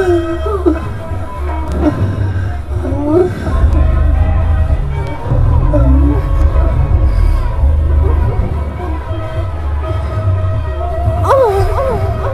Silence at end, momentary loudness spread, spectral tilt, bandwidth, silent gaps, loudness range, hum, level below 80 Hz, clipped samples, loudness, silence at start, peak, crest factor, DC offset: 0 s; 8 LU; -9 dB/octave; 10.5 kHz; none; 3 LU; none; -14 dBFS; under 0.1%; -14 LUFS; 0 s; 0 dBFS; 12 dB; under 0.1%